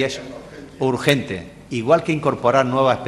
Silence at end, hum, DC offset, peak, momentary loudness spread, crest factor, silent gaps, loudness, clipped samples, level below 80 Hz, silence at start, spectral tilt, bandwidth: 0 s; none; under 0.1%; 0 dBFS; 16 LU; 20 dB; none; -19 LUFS; under 0.1%; -52 dBFS; 0 s; -5.5 dB/octave; 12.5 kHz